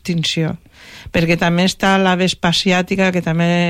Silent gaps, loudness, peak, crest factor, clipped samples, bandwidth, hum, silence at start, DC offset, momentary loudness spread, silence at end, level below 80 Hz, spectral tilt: none; -16 LUFS; -4 dBFS; 12 dB; under 0.1%; 14.5 kHz; none; 0.05 s; under 0.1%; 7 LU; 0 s; -42 dBFS; -5 dB/octave